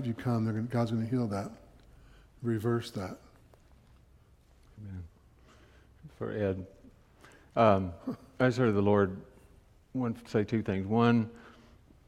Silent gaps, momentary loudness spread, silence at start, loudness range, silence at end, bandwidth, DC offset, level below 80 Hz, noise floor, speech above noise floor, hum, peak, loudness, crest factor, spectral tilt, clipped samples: none; 19 LU; 0 s; 12 LU; 0.55 s; 13.5 kHz; under 0.1%; -60 dBFS; -61 dBFS; 31 dB; none; -8 dBFS; -31 LUFS; 24 dB; -8 dB/octave; under 0.1%